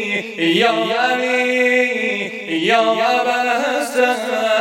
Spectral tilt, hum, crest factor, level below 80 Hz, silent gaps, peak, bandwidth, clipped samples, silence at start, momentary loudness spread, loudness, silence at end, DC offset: -3.5 dB/octave; none; 16 dB; -76 dBFS; none; -2 dBFS; 17 kHz; under 0.1%; 0 s; 5 LU; -16 LUFS; 0 s; under 0.1%